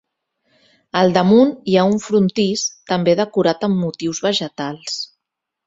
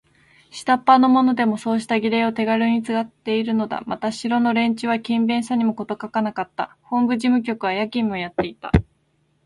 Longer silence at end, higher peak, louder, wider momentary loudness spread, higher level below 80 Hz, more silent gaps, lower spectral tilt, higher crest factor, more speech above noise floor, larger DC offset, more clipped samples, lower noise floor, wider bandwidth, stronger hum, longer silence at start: about the same, 0.6 s vs 0.6 s; about the same, 0 dBFS vs 0 dBFS; first, -17 LUFS vs -21 LUFS; about the same, 12 LU vs 10 LU; second, -58 dBFS vs -40 dBFS; neither; about the same, -5 dB/octave vs -6 dB/octave; about the same, 18 dB vs 20 dB; first, 65 dB vs 45 dB; neither; neither; first, -81 dBFS vs -65 dBFS; second, 8 kHz vs 11.5 kHz; neither; first, 0.95 s vs 0.55 s